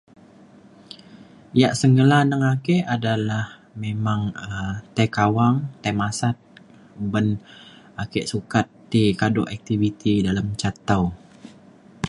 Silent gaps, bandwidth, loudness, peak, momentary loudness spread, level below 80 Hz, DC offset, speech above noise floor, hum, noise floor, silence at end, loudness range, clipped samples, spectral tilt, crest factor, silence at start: none; 11.5 kHz; -22 LUFS; -2 dBFS; 14 LU; -48 dBFS; under 0.1%; 28 dB; none; -49 dBFS; 0 s; 4 LU; under 0.1%; -6.5 dB/octave; 20 dB; 1.15 s